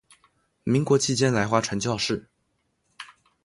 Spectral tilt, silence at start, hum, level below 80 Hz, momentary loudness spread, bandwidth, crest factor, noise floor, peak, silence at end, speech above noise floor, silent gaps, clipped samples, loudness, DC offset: -4.5 dB/octave; 0.65 s; none; -58 dBFS; 22 LU; 11.5 kHz; 22 dB; -73 dBFS; -6 dBFS; 0.4 s; 50 dB; none; under 0.1%; -24 LUFS; under 0.1%